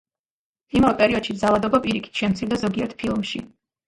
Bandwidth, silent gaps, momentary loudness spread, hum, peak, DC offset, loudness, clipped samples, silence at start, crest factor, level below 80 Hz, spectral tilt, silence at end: 11.5 kHz; none; 8 LU; none; -4 dBFS; under 0.1%; -22 LUFS; under 0.1%; 0.75 s; 20 dB; -48 dBFS; -6 dB/octave; 0.4 s